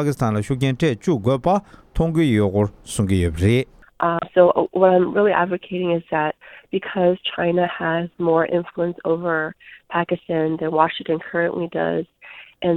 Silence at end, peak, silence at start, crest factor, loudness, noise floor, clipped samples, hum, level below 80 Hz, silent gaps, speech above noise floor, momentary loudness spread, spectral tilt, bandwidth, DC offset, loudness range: 0 s; 0 dBFS; 0 s; 20 dB; -20 LUFS; -40 dBFS; under 0.1%; none; -42 dBFS; none; 20 dB; 9 LU; -6.5 dB/octave; 14.5 kHz; under 0.1%; 4 LU